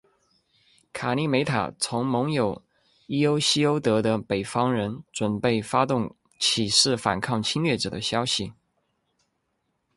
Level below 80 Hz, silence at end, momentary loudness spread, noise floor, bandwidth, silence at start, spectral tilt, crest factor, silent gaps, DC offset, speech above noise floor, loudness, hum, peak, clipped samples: -58 dBFS; 1.45 s; 9 LU; -75 dBFS; 11.5 kHz; 0.95 s; -4 dB/octave; 20 dB; none; under 0.1%; 51 dB; -24 LUFS; none; -6 dBFS; under 0.1%